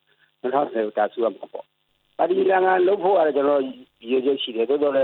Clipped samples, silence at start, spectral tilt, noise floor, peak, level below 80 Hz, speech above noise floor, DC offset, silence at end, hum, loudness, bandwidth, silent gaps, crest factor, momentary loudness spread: under 0.1%; 0.45 s; -8.5 dB/octave; -68 dBFS; -6 dBFS; -76 dBFS; 47 dB; under 0.1%; 0 s; none; -21 LUFS; 4.2 kHz; none; 16 dB; 17 LU